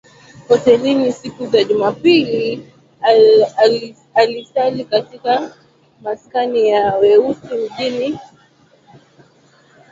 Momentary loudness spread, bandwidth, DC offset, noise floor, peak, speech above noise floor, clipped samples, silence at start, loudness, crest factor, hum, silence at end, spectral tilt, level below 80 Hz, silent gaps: 12 LU; 7.6 kHz; under 0.1%; -51 dBFS; 0 dBFS; 37 dB; under 0.1%; 0.4 s; -15 LUFS; 16 dB; none; 1.65 s; -5.5 dB/octave; -58 dBFS; none